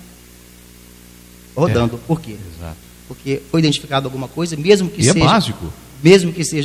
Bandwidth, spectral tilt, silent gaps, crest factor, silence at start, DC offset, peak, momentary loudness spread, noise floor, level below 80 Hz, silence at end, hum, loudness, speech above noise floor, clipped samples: 16 kHz; -5 dB/octave; none; 18 dB; 0 s; under 0.1%; 0 dBFS; 21 LU; -42 dBFS; -40 dBFS; 0 s; 60 Hz at -45 dBFS; -16 LUFS; 26 dB; 0.1%